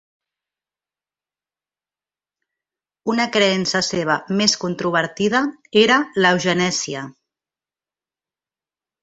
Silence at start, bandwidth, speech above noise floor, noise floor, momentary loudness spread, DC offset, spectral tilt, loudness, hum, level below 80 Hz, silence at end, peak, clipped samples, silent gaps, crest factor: 3.05 s; 8.2 kHz; over 71 dB; under -90 dBFS; 8 LU; under 0.1%; -3.5 dB/octave; -18 LUFS; none; -62 dBFS; 1.9 s; -2 dBFS; under 0.1%; none; 20 dB